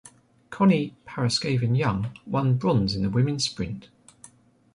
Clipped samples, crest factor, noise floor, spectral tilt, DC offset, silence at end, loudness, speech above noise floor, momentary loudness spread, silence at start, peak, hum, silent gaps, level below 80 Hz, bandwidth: under 0.1%; 16 dB; -53 dBFS; -6 dB/octave; under 0.1%; 0.9 s; -25 LUFS; 30 dB; 12 LU; 0.05 s; -10 dBFS; none; none; -50 dBFS; 11 kHz